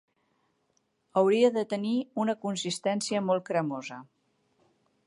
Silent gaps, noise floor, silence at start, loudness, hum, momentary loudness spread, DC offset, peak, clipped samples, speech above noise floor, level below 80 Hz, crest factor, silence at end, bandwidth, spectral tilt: none; -74 dBFS; 1.15 s; -28 LUFS; none; 11 LU; under 0.1%; -10 dBFS; under 0.1%; 46 dB; -80 dBFS; 20 dB; 1.05 s; 11.5 kHz; -5 dB/octave